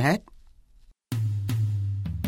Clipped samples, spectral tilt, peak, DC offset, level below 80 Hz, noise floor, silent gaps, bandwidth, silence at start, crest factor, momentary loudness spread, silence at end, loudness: under 0.1%; -7 dB/octave; -10 dBFS; under 0.1%; -46 dBFS; -56 dBFS; none; 16.5 kHz; 0 s; 18 dB; 4 LU; 0 s; -28 LUFS